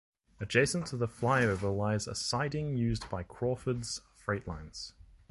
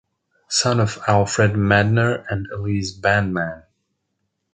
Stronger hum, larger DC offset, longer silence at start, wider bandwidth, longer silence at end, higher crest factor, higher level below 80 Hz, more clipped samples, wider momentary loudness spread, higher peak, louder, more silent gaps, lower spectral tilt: neither; neither; about the same, 0.4 s vs 0.5 s; first, 11.5 kHz vs 9.4 kHz; second, 0.4 s vs 0.95 s; about the same, 22 dB vs 18 dB; second, -52 dBFS vs -44 dBFS; neither; first, 14 LU vs 10 LU; second, -10 dBFS vs -2 dBFS; second, -33 LUFS vs -19 LUFS; neither; about the same, -5 dB/octave vs -5 dB/octave